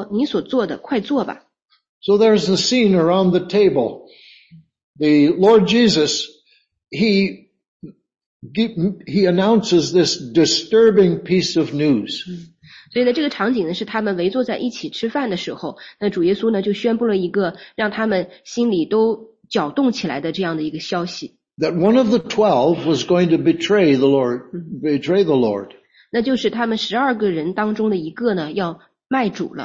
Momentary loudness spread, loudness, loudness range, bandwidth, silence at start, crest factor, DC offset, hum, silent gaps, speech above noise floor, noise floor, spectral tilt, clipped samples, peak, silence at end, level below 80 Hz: 11 LU; -18 LUFS; 5 LU; 8 kHz; 0 s; 16 dB; under 0.1%; none; 1.89-2.01 s, 4.83-4.94 s, 7.68-7.80 s, 8.26-8.40 s; 41 dB; -58 dBFS; -5.5 dB/octave; under 0.1%; -2 dBFS; 0 s; -58 dBFS